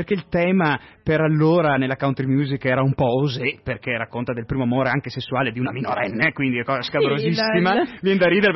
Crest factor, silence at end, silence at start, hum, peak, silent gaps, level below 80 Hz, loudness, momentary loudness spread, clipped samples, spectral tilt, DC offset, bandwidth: 14 dB; 0 s; 0 s; none; -6 dBFS; none; -50 dBFS; -21 LUFS; 8 LU; under 0.1%; -8 dB/octave; under 0.1%; 6 kHz